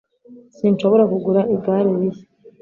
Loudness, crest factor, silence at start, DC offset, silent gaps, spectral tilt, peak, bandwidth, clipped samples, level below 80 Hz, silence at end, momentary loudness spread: -18 LUFS; 16 dB; 0.3 s; under 0.1%; none; -9.5 dB/octave; -4 dBFS; 7.2 kHz; under 0.1%; -62 dBFS; 0.1 s; 7 LU